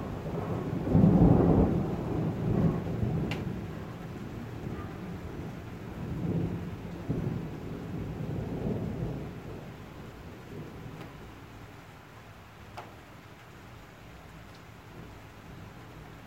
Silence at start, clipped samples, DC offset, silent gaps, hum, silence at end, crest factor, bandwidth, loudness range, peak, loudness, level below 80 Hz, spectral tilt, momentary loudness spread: 0 s; under 0.1%; under 0.1%; none; none; 0 s; 22 dB; 16 kHz; 22 LU; -10 dBFS; -31 LUFS; -44 dBFS; -9 dB/octave; 23 LU